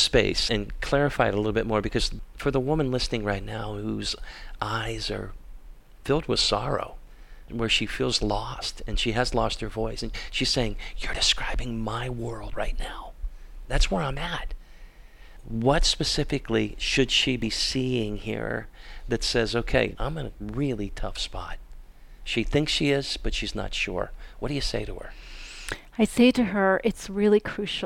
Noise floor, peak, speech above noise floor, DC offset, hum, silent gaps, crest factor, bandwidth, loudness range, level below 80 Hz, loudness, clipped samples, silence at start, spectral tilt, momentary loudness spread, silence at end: -46 dBFS; -6 dBFS; 20 dB; under 0.1%; none; none; 20 dB; 16 kHz; 5 LU; -34 dBFS; -26 LUFS; under 0.1%; 0 s; -4 dB/octave; 14 LU; 0 s